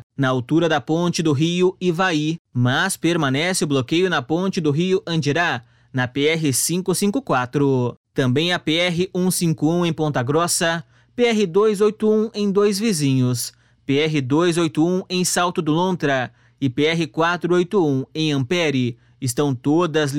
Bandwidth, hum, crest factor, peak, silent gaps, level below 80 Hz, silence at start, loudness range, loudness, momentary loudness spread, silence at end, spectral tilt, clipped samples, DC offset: 16.5 kHz; none; 14 dB; -6 dBFS; 2.39-2.45 s, 7.97-8.04 s; -60 dBFS; 0.2 s; 1 LU; -20 LUFS; 5 LU; 0 s; -5 dB/octave; under 0.1%; 0.1%